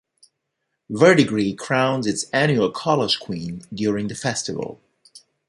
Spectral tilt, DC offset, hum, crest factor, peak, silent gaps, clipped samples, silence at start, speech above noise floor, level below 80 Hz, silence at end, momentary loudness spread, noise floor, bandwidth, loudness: -4.5 dB/octave; under 0.1%; none; 20 dB; -2 dBFS; none; under 0.1%; 0.9 s; 57 dB; -58 dBFS; 0.3 s; 15 LU; -77 dBFS; 11.5 kHz; -20 LUFS